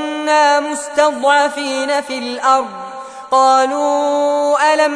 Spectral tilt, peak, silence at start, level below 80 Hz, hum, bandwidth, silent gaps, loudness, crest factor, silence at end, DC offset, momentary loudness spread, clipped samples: -1 dB/octave; -2 dBFS; 0 s; -64 dBFS; none; 11 kHz; none; -14 LUFS; 12 dB; 0 s; under 0.1%; 9 LU; under 0.1%